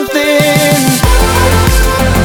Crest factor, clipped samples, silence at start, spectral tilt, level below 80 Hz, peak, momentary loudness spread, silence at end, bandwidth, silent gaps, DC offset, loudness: 8 dB; under 0.1%; 0 s; -4.5 dB/octave; -14 dBFS; 0 dBFS; 2 LU; 0 s; over 20 kHz; none; under 0.1%; -9 LUFS